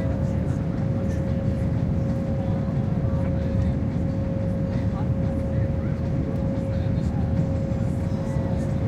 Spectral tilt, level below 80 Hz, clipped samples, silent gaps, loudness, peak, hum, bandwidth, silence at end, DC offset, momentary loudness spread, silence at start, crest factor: -9.5 dB/octave; -32 dBFS; under 0.1%; none; -25 LUFS; -12 dBFS; none; 8.8 kHz; 0 s; under 0.1%; 2 LU; 0 s; 12 dB